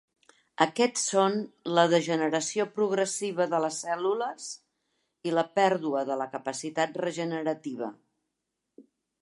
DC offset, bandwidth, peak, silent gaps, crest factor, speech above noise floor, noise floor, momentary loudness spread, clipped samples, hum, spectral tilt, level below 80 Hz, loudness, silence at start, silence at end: under 0.1%; 11.5 kHz; -6 dBFS; none; 24 dB; 56 dB; -84 dBFS; 11 LU; under 0.1%; none; -4 dB/octave; -84 dBFS; -28 LUFS; 0.6 s; 0.4 s